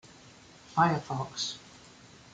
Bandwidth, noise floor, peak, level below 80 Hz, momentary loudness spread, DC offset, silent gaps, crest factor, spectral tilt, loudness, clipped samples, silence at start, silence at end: 9.4 kHz; -54 dBFS; -12 dBFS; -66 dBFS; 25 LU; under 0.1%; none; 22 dB; -4.5 dB/octave; -30 LUFS; under 0.1%; 0.25 s; 0.55 s